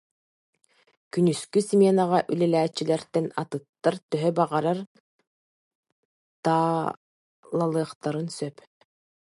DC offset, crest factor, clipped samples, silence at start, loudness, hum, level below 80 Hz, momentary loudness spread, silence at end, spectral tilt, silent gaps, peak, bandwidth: under 0.1%; 18 dB; under 0.1%; 1.15 s; -25 LUFS; none; -74 dBFS; 12 LU; 0.85 s; -6.5 dB/octave; 3.69-3.73 s, 4.03-4.09 s, 4.87-5.19 s, 5.27-5.83 s, 5.92-6.43 s, 6.97-7.43 s, 7.95-8.01 s; -8 dBFS; 11.5 kHz